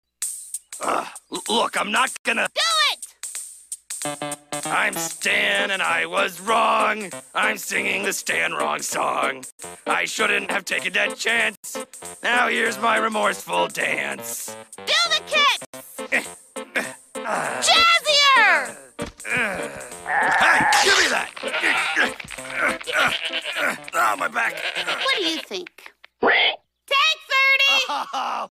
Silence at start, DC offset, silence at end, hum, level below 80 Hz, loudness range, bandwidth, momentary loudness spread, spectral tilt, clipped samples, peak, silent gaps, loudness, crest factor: 0.2 s; under 0.1%; 0.1 s; none; -60 dBFS; 4 LU; 15.5 kHz; 17 LU; -0.5 dB/octave; under 0.1%; -4 dBFS; 2.19-2.24 s, 9.52-9.58 s, 11.57-11.63 s, 15.66-15.73 s; -20 LUFS; 18 dB